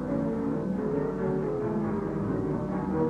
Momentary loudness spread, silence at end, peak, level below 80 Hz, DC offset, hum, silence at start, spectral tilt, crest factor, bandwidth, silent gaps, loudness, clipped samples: 1 LU; 0 s; -16 dBFS; -48 dBFS; under 0.1%; none; 0 s; -10 dB/octave; 12 dB; 9.2 kHz; none; -30 LUFS; under 0.1%